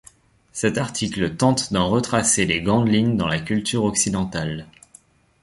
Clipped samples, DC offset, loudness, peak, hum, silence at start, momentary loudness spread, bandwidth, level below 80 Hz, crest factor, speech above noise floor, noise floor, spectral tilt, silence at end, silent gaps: under 0.1%; under 0.1%; -21 LUFS; -4 dBFS; none; 0.55 s; 8 LU; 11.5 kHz; -46 dBFS; 18 dB; 32 dB; -53 dBFS; -4 dB/octave; 0.8 s; none